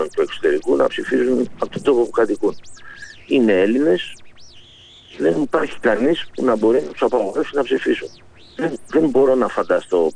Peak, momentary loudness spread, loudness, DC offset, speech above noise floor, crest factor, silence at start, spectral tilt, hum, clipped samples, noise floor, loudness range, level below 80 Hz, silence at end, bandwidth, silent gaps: -4 dBFS; 9 LU; -18 LUFS; under 0.1%; 27 dB; 14 dB; 0 s; -5.5 dB/octave; none; under 0.1%; -45 dBFS; 1 LU; -52 dBFS; 0 s; 10.5 kHz; none